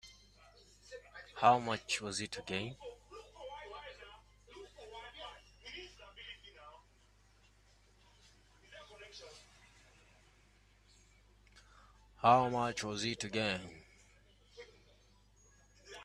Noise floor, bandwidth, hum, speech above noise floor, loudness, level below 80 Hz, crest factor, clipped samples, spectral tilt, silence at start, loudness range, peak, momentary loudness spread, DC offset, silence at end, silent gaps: -67 dBFS; 12.5 kHz; 50 Hz at -65 dBFS; 33 dB; -35 LUFS; -66 dBFS; 28 dB; under 0.1%; -4 dB/octave; 0.05 s; 22 LU; -14 dBFS; 27 LU; under 0.1%; 0 s; none